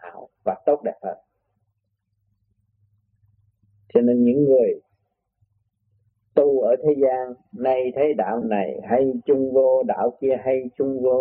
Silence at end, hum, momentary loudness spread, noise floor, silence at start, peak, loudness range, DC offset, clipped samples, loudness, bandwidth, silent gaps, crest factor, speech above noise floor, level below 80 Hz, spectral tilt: 0 s; none; 12 LU; -74 dBFS; 0.05 s; -2 dBFS; 9 LU; under 0.1%; under 0.1%; -21 LUFS; 3.3 kHz; none; 20 dB; 54 dB; -64 dBFS; -11.5 dB/octave